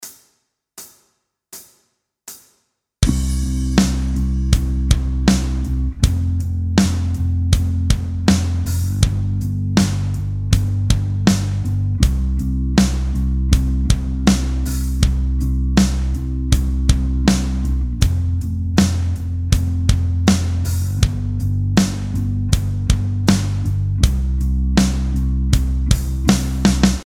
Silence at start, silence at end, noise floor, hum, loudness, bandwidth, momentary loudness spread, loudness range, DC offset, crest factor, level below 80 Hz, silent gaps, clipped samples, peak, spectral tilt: 0 s; 0 s; -66 dBFS; none; -19 LUFS; 16 kHz; 5 LU; 1 LU; under 0.1%; 18 dB; -22 dBFS; none; under 0.1%; 0 dBFS; -5.5 dB/octave